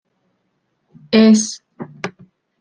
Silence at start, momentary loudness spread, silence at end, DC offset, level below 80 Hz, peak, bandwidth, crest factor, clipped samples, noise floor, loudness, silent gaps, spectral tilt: 1.1 s; 21 LU; 0.5 s; under 0.1%; -64 dBFS; -2 dBFS; 10 kHz; 16 dB; under 0.1%; -69 dBFS; -14 LUFS; none; -4.5 dB/octave